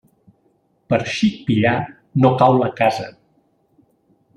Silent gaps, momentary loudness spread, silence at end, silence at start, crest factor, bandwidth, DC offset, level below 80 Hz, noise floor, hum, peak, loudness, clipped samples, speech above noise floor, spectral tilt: none; 10 LU; 1.25 s; 0.9 s; 18 dB; 10.5 kHz; under 0.1%; -56 dBFS; -62 dBFS; none; -2 dBFS; -18 LUFS; under 0.1%; 45 dB; -7 dB/octave